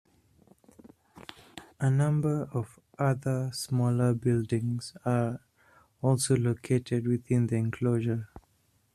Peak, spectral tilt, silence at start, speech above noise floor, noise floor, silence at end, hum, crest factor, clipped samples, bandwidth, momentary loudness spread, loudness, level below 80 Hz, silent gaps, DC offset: -12 dBFS; -7 dB/octave; 1.55 s; 42 dB; -69 dBFS; 0.55 s; none; 18 dB; under 0.1%; 13.5 kHz; 17 LU; -29 LUFS; -62 dBFS; none; under 0.1%